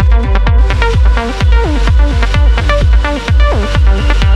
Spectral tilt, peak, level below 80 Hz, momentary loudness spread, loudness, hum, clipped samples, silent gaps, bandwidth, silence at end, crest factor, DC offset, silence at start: -6.5 dB/octave; 0 dBFS; -10 dBFS; 1 LU; -11 LUFS; none; under 0.1%; none; 8.2 kHz; 0 s; 8 dB; under 0.1%; 0 s